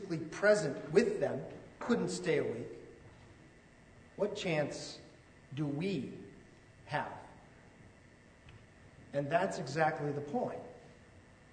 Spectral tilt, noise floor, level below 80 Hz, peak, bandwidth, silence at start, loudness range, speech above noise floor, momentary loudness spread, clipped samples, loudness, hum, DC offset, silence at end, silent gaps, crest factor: -5.5 dB/octave; -60 dBFS; -68 dBFS; -14 dBFS; 9.6 kHz; 0 s; 8 LU; 26 dB; 21 LU; under 0.1%; -35 LUFS; none; under 0.1%; 0.3 s; none; 24 dB